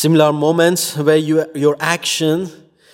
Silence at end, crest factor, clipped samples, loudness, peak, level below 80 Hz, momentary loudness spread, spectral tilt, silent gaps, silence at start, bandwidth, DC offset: 0.4 s; 16 dB; under 0.1%; -15 LUFS; 0 dBFS; -66 dBFS; 5 LU; -4.5 dB/octave; none; 0 s; 16.5 kHz; under 0.1%